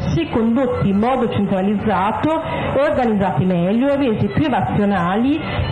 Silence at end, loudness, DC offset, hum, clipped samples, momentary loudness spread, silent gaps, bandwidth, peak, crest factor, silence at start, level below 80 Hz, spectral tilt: 0 s; -17 LUFS; under 0.1%; none; under 0.1%; 3 LU; none; 10 kHz; -6 dBFS; 10 dB; 0 s; -38 dBFS; -8.5 dB/octave